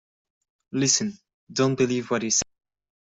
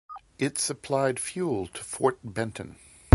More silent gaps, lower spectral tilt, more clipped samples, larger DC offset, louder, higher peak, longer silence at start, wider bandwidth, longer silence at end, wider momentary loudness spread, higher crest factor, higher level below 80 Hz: first, 1.34-1.47 s vs none; second, -3.5 dB/octave vs -5 dB/octave; neither; neither; first, -24 LUFS vs -29 LUFS; second, -4 dBFS vs 0 dBFS; first, 0.75 s vs 0.1 s; second, 8.2 kHz vs 12 kHz; first, 0.6 s vs 0.4 s; about the same, 12 LU vs 11 LU; about the same, 22 dB vs 24 dB; second, -62 dBFS vs -56 dBFS